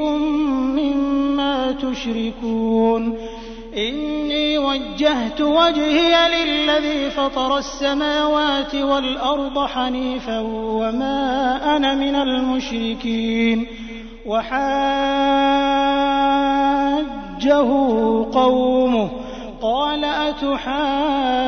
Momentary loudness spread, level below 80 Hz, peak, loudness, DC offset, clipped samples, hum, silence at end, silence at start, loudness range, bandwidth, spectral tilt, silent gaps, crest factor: 8 LU; -40 dBFS; -2 dBFS; -19 LUFS; under 0.1%; under 0.1%; none; 0 s; 0 s; 4 LU; 6.6 kHz; -4.5 dB/octave; none; 18 dB